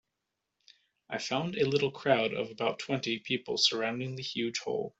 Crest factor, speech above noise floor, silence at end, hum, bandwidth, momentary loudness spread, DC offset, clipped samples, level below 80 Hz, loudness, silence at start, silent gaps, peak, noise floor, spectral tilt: 22 dB; 54 dB; 0.1 s; none; 8.2 kHz; 8 LU; under 0.1%; under 0.1%; -72 dBFS; -31 LUFS; 1.1 s; none; -10 dBFS; -85 dBFS; -4 dB/octave